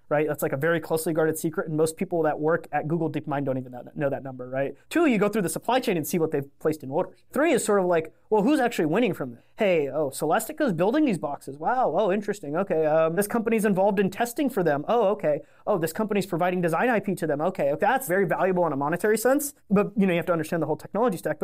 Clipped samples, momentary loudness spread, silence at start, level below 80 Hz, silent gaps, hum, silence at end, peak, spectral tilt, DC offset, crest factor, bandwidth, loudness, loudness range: under 0.1%; 7 LU; 0.1 s; -62 dBFS; none; none; 0.1 s; -12 dBFS; -5.5 dB/octave; 0.4%; 12 dB; 16 kHz; -25 LUFS; 3 LU